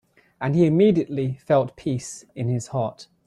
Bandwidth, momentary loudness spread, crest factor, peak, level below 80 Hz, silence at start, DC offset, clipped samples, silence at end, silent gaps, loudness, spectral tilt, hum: 12 kHz; 13 LU; 16 dB; -6 dBFS; -58 dBFS; 0.4 s; under 0.1%; under 0.1%; 0.25 s; none; -23 LUFS; -7.5 dB/octave; none